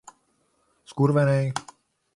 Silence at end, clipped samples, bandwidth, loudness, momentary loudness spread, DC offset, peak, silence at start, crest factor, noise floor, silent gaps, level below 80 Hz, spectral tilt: 0.55 s; under 0.1%; 11.5 kHz; -23 LUFS; 15 LU; under 0.1%; -10 dBFS; 0.9 s; 16 dB; -69 dBFS; none; -62 dBFS; -7 dB/octave